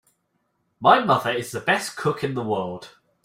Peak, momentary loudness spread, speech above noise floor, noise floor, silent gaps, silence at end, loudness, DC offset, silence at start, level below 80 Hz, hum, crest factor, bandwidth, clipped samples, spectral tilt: -2 dBFS; 10 LU; 50 dB; -72 dBFS; none; 0.35 s; -22 LUFS; under 0.1%; 0.8 s; -64 dBFS; none; 22 dB; 16 kHz; under 0.1%; -4.5 dB/octave